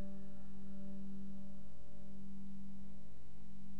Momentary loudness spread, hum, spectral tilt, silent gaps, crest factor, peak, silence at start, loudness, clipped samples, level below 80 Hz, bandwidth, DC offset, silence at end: 9 LU; none; -8.5 dB/octave; none; 12 dB; -30 dBFS; 0 s; -54 LUFS; under 0.1%; -64 dBFS; 13 kHz; 2%; 0 s